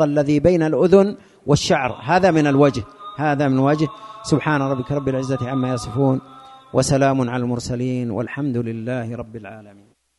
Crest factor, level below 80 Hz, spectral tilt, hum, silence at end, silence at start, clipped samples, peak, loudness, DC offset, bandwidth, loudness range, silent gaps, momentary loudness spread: 18 dB; -46 dBFS; -6.5 dB/octave; none; 0.5 s; 0 s; under 0.1%; 0 dBFS; -19 LUFS; under 0.1%; 11.5 kHz; 5 LU; none; 11 LU